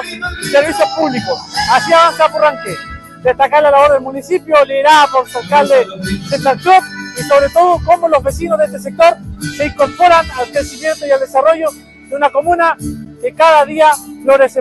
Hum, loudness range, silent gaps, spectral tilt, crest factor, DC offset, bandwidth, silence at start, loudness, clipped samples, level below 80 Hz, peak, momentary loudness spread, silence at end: none; 3 LU; none; -4 dB/octave; 12 dB; under 0.1%; 12.5 kHz; 0 s; -11 LUFS; under 0.1%; -38 dBFS; 0 dBFS; 13 LU; 0 s